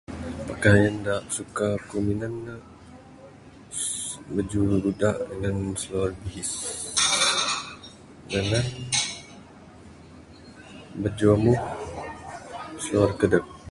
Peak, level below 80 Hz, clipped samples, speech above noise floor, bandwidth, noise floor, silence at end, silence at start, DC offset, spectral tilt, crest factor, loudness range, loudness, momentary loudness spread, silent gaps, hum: -4 dBFS; -46 dBFS; under 0.1%; 23 dB; 11.5 kHz; -47 dBFS; 0 s; 0.1 s; under 0.1%; -4 dB/octave; 22 dB; 5 LU; -25 LUFS; 19 LU; none; none